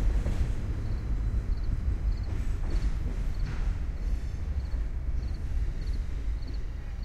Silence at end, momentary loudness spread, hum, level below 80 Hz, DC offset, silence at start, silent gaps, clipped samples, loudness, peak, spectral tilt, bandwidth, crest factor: 0 s; 4 LU; none; -30 dBFS; under 0.1%; 0 s; none; under 0.1%; -34 LUFS; -16 dBFS; -7.5 dB/octave; 8.4 kHz; 14 dB